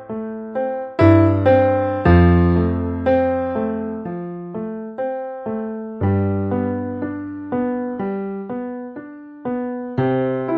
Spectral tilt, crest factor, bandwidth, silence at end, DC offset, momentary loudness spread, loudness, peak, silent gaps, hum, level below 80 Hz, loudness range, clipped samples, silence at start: -11 dB/octave; 18 dB; 5.4 kHz; 0 s; under 0.1%; 15 LU; -20 LUFS; 0 dBFS; none; none; -36 dBFS; 9 LU; under 0.1%; 0 s